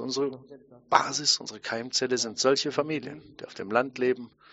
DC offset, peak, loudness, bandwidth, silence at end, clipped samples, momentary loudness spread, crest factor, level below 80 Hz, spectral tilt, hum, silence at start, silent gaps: under 0.1%; -4 dBFS; -27 LUFS; 8 kHz; 0.25 s; under 0.1%; 16 LU; 26 dB; -72 dBFS; -1.5 dB/octave; none; 0 s; none